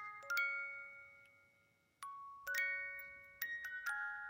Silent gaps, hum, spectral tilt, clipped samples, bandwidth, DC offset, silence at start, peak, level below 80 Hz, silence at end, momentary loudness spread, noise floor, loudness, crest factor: none; none; 0.5 dB/octave; under 0.1%; 16.5 kHz; under 0.1%; 0 s; -24 dBFS; -84 dBFS; 0 s; 16 LU; -76 dBFS; -42 LUFS; 20 dB